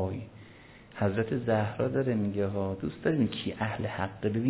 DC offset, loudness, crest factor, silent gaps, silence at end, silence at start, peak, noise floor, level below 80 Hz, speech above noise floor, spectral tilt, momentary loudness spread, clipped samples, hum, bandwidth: under 0.1%; -31 LUFS; 18 dB; none; 0 s; 0 s; -12 dBFS; -52 dBFS; -52 dBFS; 23 dB; -6.5 dB/octave; 13 LU; under 0.1%; none; 4 kHz